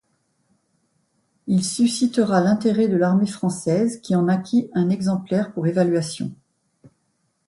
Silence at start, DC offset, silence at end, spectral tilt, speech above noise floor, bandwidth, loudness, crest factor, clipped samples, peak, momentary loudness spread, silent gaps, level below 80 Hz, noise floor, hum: 1.45 s; under 0.1%; 1.15 s; -6 dB/octave; 50 dB; 11.5 kHz; -21 LUFS; 16 dB; under 0.1%; -6 dBFS; 6 LU; none; -64 dBFS; -70 dBFS; none